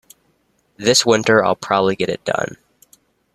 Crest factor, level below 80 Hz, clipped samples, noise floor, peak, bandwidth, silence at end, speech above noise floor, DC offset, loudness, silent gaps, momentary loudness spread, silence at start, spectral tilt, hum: 18 dB; -58 dBFS; under 0.1%; -63 dBFS; -2 dBFS; 14 kHz; 0.8 s; 46 dB; under 0.1%; -17 LUFS; none; 9 LU; 0.8 s; -3 dB/octave; none